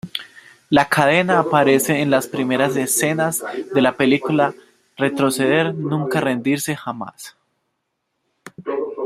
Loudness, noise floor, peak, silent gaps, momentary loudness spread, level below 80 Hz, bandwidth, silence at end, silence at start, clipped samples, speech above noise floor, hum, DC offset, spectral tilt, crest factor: -18 LUFS; -74 dBFS; 0 dBFS; none; 14 LU; -60 dBFS; 16 kHz; 0 s; 0.05 s; under 0.1%; 56 dB; none; under 0.1%; -4.5 dB/octave; 18 dB